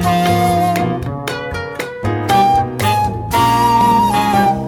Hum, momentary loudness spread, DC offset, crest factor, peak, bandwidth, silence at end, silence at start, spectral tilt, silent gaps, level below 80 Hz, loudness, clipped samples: none; 11 LU; under 0.1%; 12 dB; -2 dBFS; 19 kHz; 0 s; 0 s; -5.5 dB/octave; none; -36 dBFS; -15 LUFS; under 0.1%